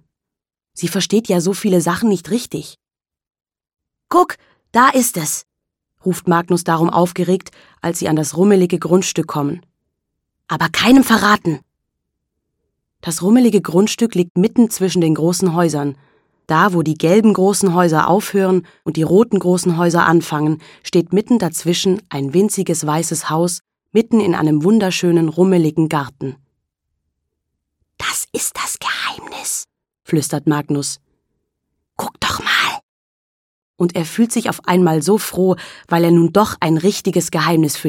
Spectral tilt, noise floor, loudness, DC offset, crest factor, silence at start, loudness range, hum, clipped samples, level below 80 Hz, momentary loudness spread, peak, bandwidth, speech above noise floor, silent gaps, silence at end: -5 dB/octave; -85 dBFS; -16 LUFS; under 0.1%; 16 dB; 0.75 s; 6 LU; none; under 0.1%; -54 dBFS; 11 LU; 0 dBFS; 17.5 kHz; 70 dB; 14.30-14.35 s, 32.83-33.74 s; 0 s